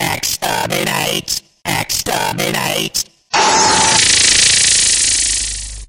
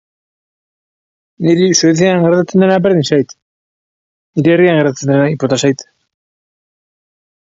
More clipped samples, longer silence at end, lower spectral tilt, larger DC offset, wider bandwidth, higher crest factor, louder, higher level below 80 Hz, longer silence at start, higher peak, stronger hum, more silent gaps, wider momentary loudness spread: neither; second, 0.05 s vs 1.75 s; second, -0.5 dB/octave vs -5.5 dB/octave; neither; first, 16.5 kHz vs 7.8 kHz; about the same, 14 dB vs 14 dB; about the same, -12 LUFS vs -12 LUFS; first, -38 dBFS vs -56 dBFS; second, 0 s vs 1.4 s; about the same, 0 dBFS vs 0 dBFS; neither; second, none vs 3.42-4.33 s; first, 11 LU vs 7 LU